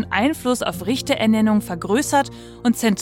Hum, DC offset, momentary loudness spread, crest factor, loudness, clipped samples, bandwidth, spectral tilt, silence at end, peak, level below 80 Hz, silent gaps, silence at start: none; under 0.1%; 6 LU; 16 dB; -20 LUFS; under 0.1%; 17 kHz; -4.5 dB/octave; 0 s; -4 dBFS; -48 dBFS; none; 0 s